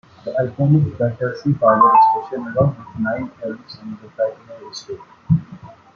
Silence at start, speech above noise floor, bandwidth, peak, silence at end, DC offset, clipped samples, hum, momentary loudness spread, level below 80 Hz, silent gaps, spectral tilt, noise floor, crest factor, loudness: 0.25 s; 22 dB; 6.8 kHz; -2 dBFS; 0.25 s; under 0.1%; under 0.1%; none; 21 LU; -52 dBFS; none; -8.5 dB/octave; -40 dBFS; 18 dB; -18 LUFS